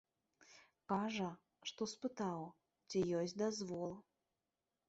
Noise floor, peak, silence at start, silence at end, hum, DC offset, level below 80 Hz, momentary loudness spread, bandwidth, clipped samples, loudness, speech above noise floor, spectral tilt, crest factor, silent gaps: under -90 dBFS; -24 dBFS; 0.5 s; 0.85 s; none; under 0.1%; -80 dBFS; 17 LU; 8 kHz; under 0.1%; -43 LUFS; over 48 dB; -5 dB/octave; 20 dB; none